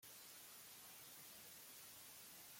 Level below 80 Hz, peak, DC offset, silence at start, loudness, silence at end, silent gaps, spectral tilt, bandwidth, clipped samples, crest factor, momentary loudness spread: under -90 dBFS; -48 dBFS; under 0.1%; 0 s; -57 LUFS; 0 s; none; -0.5 dB/octave; 16.5 kHz; under 0.1%; 12 dB; 0 LU